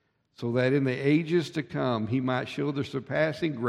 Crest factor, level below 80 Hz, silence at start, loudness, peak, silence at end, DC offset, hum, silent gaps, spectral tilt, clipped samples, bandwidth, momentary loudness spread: 16 dB; -66 dBFS; 0.4 s; -28 LUFS; -12 dBFS; 0 s; under 0.1%; none; none; -7.5 dB/octave; under 0.1%; 11.5 kHz; 6 LU